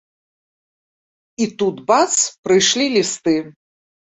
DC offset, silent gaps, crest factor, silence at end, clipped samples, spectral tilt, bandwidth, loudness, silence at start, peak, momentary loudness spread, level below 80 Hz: under 0.1%; 2.38-2.43 s; 18 dB; 0.6 s; under 0.1%; -2.5 dB/octave; 8.2 kHz; -17 LUFS; 1.4 s; -2 dBFS; 8 LU; -62 dBFS